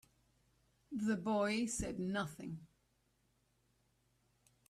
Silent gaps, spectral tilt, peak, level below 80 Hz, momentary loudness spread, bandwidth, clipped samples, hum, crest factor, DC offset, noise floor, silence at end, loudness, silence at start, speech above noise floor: none; -4.5 dB/octave; -24 dBFS; -64 dBFS; 13 LU; 14 kHz; under 0.1%; none; 18 dB; under 0.1%; -78 dBFS; 2.05 s; -39 LUFS; 0.9 s; 40 dB